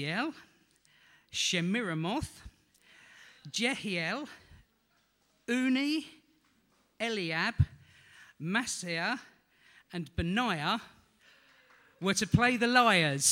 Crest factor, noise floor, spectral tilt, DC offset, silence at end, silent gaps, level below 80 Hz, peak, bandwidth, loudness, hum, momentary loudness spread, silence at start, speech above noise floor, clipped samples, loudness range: 24 dB; -72 dBFS; -3.5 dB/octave; under 0.1%; 0 s; none; -54 dBFS; -10 dBFS; 16.5 kHz; -31 LUFS; none; 15 LU; 0 s; 42 dB; under 0.1%; 5 LU